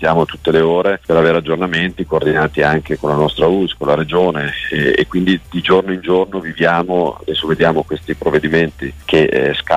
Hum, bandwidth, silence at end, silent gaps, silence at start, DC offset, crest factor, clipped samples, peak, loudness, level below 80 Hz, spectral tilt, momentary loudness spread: none; 14 kHz; 0 s; none; 0 s; under 0.1%; 12 dB; under 0.1%; -2 dBFS; -15 LUFS; -38 dBFS; -7 dB/octave; 5 LU